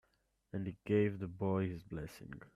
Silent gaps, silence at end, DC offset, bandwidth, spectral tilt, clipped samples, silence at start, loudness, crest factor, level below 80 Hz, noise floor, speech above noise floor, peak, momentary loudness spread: none; 0.1 s; under 0.1%; 13.5 kHz; -8.5 dB/octave; under 0.1%; 0.55 s; -38 LUFS; 18 dB; -64 dBFS; -78 dBFS; 41 dB; -22 dBFS; 14 LU